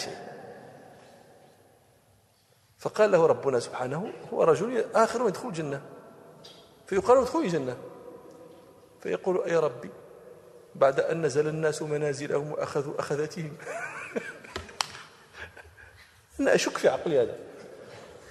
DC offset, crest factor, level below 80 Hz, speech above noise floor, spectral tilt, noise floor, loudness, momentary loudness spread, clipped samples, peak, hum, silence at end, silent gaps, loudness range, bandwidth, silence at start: under 0.1%; 26 dB; -64 dBFS; 37 dB; -5 dB/octave; -64 dBFS; -27 LUFS; 24 LU; under 0.1%; -4 dBFS; none; 0 s; none; 7 LU; 13 kHz; 0 s